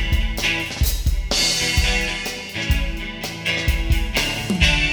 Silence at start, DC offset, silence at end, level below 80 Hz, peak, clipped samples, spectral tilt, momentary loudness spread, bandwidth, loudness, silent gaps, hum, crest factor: 0 s; under 0.1%; 0 s; -24 dBFS; -2 dBFS; under 0.1%; -3 dB/octave; 9 LU; over 20 kHz; -20 LUFS; none; none; 18 dB